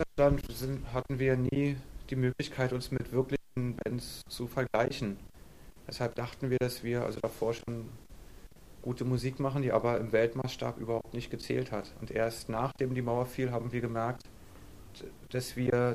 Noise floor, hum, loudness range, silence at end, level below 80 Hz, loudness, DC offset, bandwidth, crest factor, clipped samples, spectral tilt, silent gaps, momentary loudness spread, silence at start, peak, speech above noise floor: -53 dBFS; none; 3 LU; 0 s; -50 dBFS; -33 LUFS; 0.1%; 15.5 kHz; 20 dB; under 0.1%; -6.5 dB/octave; none; 12 LU; 0 s; -14 dBFS; 21 dB